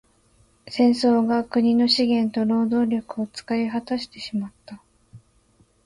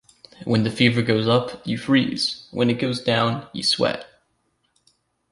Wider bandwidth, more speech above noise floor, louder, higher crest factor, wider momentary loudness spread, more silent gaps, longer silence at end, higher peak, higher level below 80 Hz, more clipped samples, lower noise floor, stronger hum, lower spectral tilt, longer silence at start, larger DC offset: about the same, 11 kHz vs 11.5 kHz; second, 39 dB vs 48 dB; about the same, -22 LUFS vs -21 LUFS; about the same, 16 dB vs 20 dB; first, 12 LU vs 7 LU; neither; second, 0.7 s vs 1.25 s; second, -8 dBFS vs -2 dBFS; about the same, -62 dBFS vs -58 dBFS; neither; second, -60 dBFS vs -69 dBFS; neither; about the same, -5.5 dB/octave vs -5.5 dB/octave; first, 0.65 s vs 0.4 s; neither